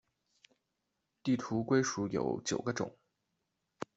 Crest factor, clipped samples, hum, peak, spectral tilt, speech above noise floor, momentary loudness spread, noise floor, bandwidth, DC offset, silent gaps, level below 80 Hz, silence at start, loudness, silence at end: 20 dB; under 0.1%; none; -16 dBFS; -5 dB/octave; 51 dB; 10 LU; -85 dBFS; 8 kHz; under 0.1%; none; -70 dBFS; 1.25 s; -34 LUFS; 0.15 s